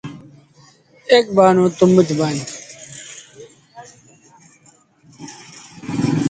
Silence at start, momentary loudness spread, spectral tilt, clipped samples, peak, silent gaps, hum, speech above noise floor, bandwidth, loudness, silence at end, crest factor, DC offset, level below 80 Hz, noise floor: 0.05 s; 24 LU; -6 dB/octave; under 0.1%; 0 dBFS; none; none; 39 dB; 9.4 kHz; -15 LUFS; 0 s; 20 dB; under 0.1%; -58 dBFS; -53 dBFS